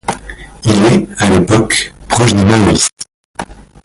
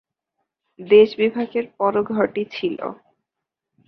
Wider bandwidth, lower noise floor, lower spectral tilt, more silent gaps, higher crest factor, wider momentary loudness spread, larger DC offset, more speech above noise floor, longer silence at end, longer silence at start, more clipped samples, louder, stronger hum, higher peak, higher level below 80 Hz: first, 11.5 kHz vs 5.8 kHz; second, -30 dBFS vs -84 dBFS; second, -4.5 dB/octave vs -7.5 dB/octave; first, 2.93-2.97 s, 3.14-3.34 s vs none; second, 12 dB vs 18 dB; first, 18 LU vs 12 LU; neither; second, 20 dB vs 65 dB; second, 0.3 s vs 0.95 s; second, 0.05 s vs 0.8 s; neither; first, -11 LUFS vs -19 LUFS; neither; about the same, 0 dBFS vs -2 dBFS; first, -32 dBFS vs -64 dBFS